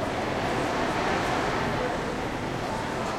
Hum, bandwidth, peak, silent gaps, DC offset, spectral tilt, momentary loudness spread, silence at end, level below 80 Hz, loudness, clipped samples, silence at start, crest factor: none; 16.5 kHz; -14 dBFS; none; under 0.1%; -5 dB/octave; 4 LU; 0 s; -44 dBFS; -28 LUFS; under 0.1%; 0 s; 14 dB